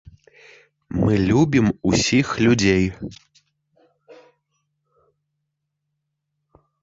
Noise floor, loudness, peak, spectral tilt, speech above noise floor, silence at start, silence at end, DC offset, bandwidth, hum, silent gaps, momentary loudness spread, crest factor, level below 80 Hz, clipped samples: -78 dBFS; -19 LUFS; -4 dBFS; -5.5 dB/octave; 59 dB; 0.9 s; 2.7 s; under 0.1%; 7.8 kHz; none; none; 12 LU; 18 dB; -44 dBFS; under 0.1%